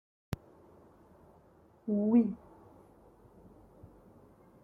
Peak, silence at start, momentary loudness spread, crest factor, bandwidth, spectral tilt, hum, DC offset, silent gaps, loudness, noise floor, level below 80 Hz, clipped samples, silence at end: -16 dBFS; 0.3 s; 18 LU; 20 dB; 9.8 kHz; -9.5 dB/octave; none; under 0.1%; none; -32 LUFS; -62 dBFS; -64 dBFS; under 0.1%; 0.8 s